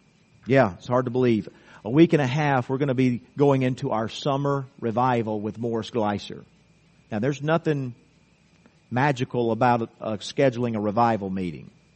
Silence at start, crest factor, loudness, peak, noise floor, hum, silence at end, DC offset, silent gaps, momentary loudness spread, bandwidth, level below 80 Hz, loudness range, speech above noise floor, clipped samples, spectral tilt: 0.45 s; 20 dB; -24 LUFS; -4 dBFS; -59 dBFS; none; 0.3 s; under 0.1%; none; 10 LU; 8.4 kHz; -60 dBFS; 6 LU; 36 dB; under 0.1%; -7.5 dB/octave